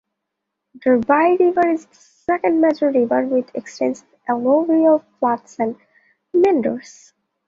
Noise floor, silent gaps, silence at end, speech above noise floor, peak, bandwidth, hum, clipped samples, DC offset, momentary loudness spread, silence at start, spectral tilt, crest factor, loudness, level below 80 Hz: -79 dBFS; none; 0.65 s; 61 dB; -2 dBFS; 7.6 kHz; none; under 0.1%; under 0.1%; 10 LU; 0.75 s; -6.5 dB/octave; 18 dB; -18 LUFS; -62 dBFS